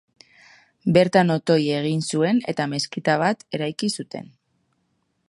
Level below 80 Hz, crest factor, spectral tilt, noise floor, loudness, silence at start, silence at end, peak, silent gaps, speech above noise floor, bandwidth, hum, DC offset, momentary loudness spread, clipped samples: -64 dBFS; 22 dB; -5.5 dB/octave; -70 dBFS; -22 LUFS; 0.85 s; 1.05 s; -2 dBFS; none; 49 dB; 11.5 kHz; none; under 0.1%; 10 LU; under 0.1%